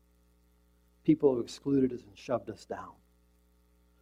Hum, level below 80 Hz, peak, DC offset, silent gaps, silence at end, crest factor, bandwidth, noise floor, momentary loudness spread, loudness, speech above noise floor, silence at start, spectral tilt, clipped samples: 60 Hz at -60 dBFS; -64 dBFS; -12 dBFS; under 0.1%; none; 1.1 s; 22 dB; 11 kHz; -67 dBFS; 16 LU; -31 LUFS; 36 dB; 1.05 s; -7.5 dB/octave; under 0.1%